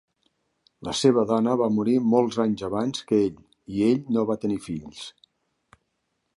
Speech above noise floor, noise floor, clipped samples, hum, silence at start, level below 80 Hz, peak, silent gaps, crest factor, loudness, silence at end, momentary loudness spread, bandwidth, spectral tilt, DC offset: 53 dB; -76 dBFS; under 0.1%; none; 0.8 s; -60 dBFS; -6 dBFS; none; 18 dB; -24 LUFS; 1.25 s; 14 LU; 11.5 kHz; -6 dB/octave; under 0.1%